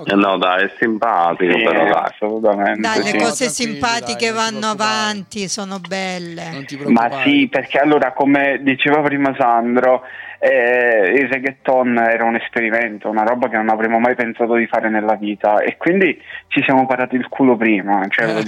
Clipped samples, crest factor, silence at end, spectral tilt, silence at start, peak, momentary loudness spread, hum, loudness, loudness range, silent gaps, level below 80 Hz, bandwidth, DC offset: under 0.1%; 14 dB; 0 s; -4 dB/octave; 0 s; -2 dBFS; 7 LU; none; -16 LUFS; 4 LU; none; -62 dBFS; 13 kHz; under 0.1%